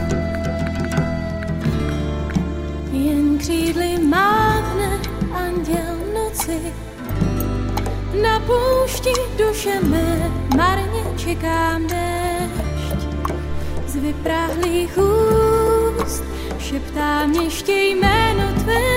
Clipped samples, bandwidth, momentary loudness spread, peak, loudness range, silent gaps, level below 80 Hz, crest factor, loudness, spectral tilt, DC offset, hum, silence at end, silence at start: under 0.1%; 16.5 kHz; 9 LU; -2 dBFS; 4 LU; none; -28 dBFS; 16 dB; -20 LUFS; -5.5 dB/octave; under 0.1%; none; 0 s; 0 s